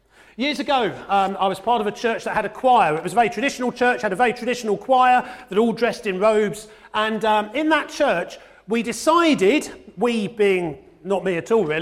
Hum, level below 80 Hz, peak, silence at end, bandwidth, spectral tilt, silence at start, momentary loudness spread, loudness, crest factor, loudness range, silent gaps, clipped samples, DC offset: none; -56 dBFS; -4 dBFS; 0 s; 15 kHz; -4.5 dB/octave; 0.4 s; 8 LU; -20 LUFS; 16 dB; 2 LU; none; under 0.1%; under 0.1%